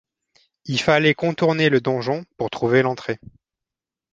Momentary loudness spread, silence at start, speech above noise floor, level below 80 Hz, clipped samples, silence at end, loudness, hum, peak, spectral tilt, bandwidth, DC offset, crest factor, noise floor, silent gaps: 12 LU; 0.65 s; 68 dB; -58 dBFS; under 0.1%; 0.95 s; -20 LUFS; none; -2 dBFS; -6 dB/octave; 9.2 kHz; under 0.1%; 20 dB; -88 dBFS; none